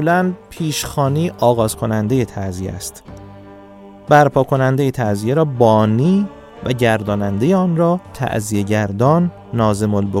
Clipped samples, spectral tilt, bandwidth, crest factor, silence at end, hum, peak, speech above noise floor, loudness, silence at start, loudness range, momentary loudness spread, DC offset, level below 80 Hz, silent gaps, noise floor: under 0.1%; -6.5 dB/octave; 16.5 kHz; 16 dB; 0 s; none; 0 dBFS; 23 dB; -16 LUFS; 0 s; 4 LU; 12 LU; under 0.1%; -46 dBFS; none; -39 dBFS